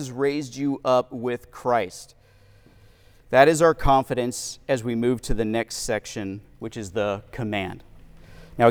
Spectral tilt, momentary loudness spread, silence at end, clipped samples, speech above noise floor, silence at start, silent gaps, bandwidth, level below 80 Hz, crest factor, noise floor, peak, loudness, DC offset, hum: -5 dB/octave; 17 LU; 0 s; under 0.1%; 30 dB; 0 s; none; over 20 kHz; -40 dBFS; 22 dB; -53 dBFS; -2 dBFS; -24 LUFS; under 0.1%; none